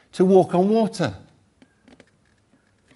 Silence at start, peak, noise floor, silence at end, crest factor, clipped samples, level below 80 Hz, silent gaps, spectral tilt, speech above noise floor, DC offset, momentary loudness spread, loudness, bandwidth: 0.15 s; -4 dBFS; -61 dBFS; 1.8 s; 18 dB; under 0.1%; -60 dBFS; none; -7.5 dB/octave; 43 dB; under 0.1%; 11 LU; -19 LUFS; 11.5 kHz